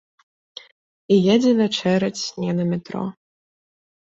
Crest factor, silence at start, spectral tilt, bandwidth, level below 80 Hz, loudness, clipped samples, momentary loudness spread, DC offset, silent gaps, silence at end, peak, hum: 18 dB; 1.1 s; -6 dB/octave; 7.8 kHz; -62 dBFS; -20 LUFS; under 0.1%; 25 LU; under 0.1%; none; 1.05 s; -4 dBFS; none